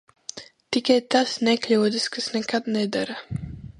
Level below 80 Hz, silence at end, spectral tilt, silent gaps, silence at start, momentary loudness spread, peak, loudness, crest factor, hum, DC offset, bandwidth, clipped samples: -52 dBFS; 0.1 s; -4 dB/octave; none; 0.35 s; 16 LU; -4 dBFS; -23 LUFS; 20 dB; none; under 0.1%; 11.5 kHz; under 0.1%